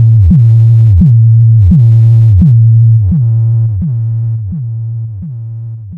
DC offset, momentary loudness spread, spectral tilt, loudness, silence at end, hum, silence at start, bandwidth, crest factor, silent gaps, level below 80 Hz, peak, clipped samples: under 0.1%; 15 LU; -12 dB/octave; -7 LUFS; 0 s; none; 0 s; 1.1 kHz; 6 dB; none; -22 dBFS; 0 dBFS; under 0.1%